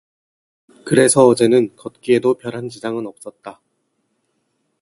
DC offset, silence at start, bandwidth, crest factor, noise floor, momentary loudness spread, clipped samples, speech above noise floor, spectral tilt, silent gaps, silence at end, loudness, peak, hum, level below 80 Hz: under 0.1%; 0.85 s; 11.5 kHz; 18 dB; -69 dBFS; 24 LU; under 0.1%; 53 dB; -4.5 dB/octave; none; 1.3 s; -16 LUFS; 0 dBFS; none; -62 dBFS